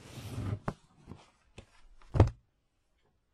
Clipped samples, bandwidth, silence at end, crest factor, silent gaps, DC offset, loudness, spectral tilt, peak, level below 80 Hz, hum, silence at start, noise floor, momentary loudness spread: under 0.1%; 13 kHz; 1 s; 30 dB; none; under 0.1%; -33 LUFS; -8 dB/octave; -4 dBFS; -44 dBFS; none; 0.05 s; -75 dBFS; 26 LU